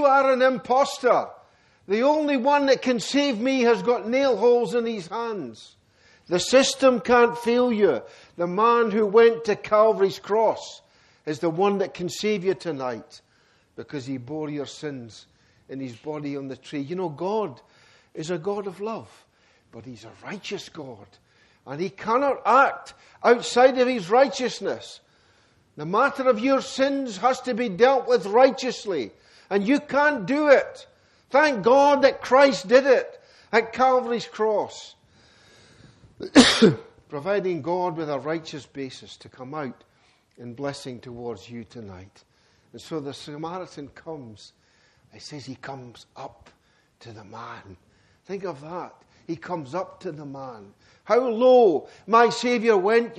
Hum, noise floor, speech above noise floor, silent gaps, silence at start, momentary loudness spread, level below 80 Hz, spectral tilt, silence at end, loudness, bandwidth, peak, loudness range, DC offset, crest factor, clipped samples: none; -62 dBFS; 39 dB; none; 0 s; 21 LU; -62 dBFS; -4.5 dB/octave; 0.05 s; -22 LUFS; 12 kHz; 0 dBFS; 17 LU; under 0.1%; 22 dB; under 0.1%